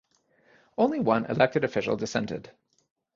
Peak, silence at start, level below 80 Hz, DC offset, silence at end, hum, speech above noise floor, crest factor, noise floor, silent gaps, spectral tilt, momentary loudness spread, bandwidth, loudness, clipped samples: -6 dBFS; 0.8 s; -62 dBFS; under 0.1%; 0.65 s; none; 39 dB; 24 dB; -65 dBFS; none; -6 dB/octave; 12 LU; 7.6 kHz; -26 LUFS; under 0.1%